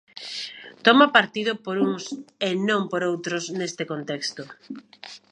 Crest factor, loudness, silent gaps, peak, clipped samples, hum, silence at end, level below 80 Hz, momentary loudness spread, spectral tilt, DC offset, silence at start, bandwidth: 24 dB; -23 LUFS; none; 0 dBFS; under 0.1%; none; 0.15 s; -74 dBFS; 23 LU; -4 dB/octave; under 0.1%; 0.15 s; 10.5 kHz